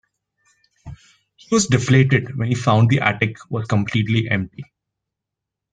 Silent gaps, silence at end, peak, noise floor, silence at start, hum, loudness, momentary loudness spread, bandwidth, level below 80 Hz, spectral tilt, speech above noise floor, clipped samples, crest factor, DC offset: none; 1.1 s; -2 dBFS; -83 dBFS; 0.85 s; none; -18 LUFS; 8 LU; 9.4 kHz; -52 dBFS; -5.5 dB/octave; 66 dB; under 0.1%; 18 dB; under 0.1%